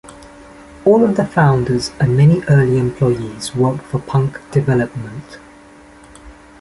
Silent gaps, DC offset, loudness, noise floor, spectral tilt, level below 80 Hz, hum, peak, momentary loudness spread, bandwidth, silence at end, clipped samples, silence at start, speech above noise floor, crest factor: none; under 0.1%; -15 LUFS; -42 dBFS; -7.5 dB/octave; -44 dBFS; none; -2 dBFS; 11 LU; 11.5 kHz; 0.3 s; under 0.1%; 0.05 s; 27 dB; 14 dB